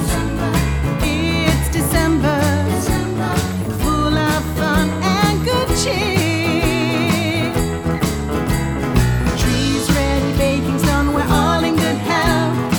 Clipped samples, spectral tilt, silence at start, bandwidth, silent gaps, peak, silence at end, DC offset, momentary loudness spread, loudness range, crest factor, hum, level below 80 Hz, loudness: under 0.1%; -5 dB/octave; 0 s; over 20 kHz; none; -2 dBFS; 0 s; under 0.1%; 4 LU; 1 LU; 16 dB; none; -26 dBFS; -17 LUFS